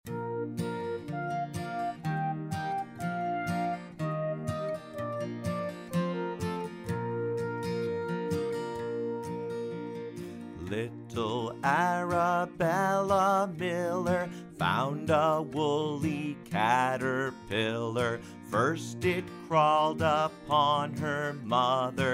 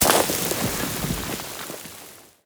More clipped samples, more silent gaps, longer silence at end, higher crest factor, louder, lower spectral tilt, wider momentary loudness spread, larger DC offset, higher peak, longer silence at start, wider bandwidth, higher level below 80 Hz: neither; neither; second, 0 s vs 0.2 s; second, 20 dB vs 26 dB; second, -31 LUFS vs -24 LUFS; first, -6 dB/octave vs -2.5 dB/octave; second, 10 LU vs 19 LU; neither; second, -10 dBFS vs 0 dBFS; about the same, 0.05 s vs 0 s; second, 16 kHz vs over 20 kHz; second, -64 dBFS vs -44 dBFS